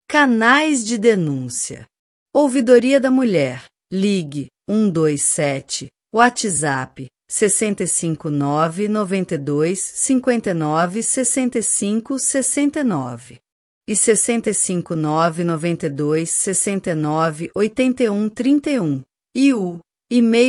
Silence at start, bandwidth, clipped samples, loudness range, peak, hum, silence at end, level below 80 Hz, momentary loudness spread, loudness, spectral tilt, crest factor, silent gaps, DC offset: 0.1 s; 14 kHz; under 0.1%; 2 LU; 0 dBFS; none; 0 s; -60 dBFS; 10 LU; -18 LUFS; -4 dB/octave; 18 dB; 1.99-2.26 s, 13.52-13.81 s; under 0.1%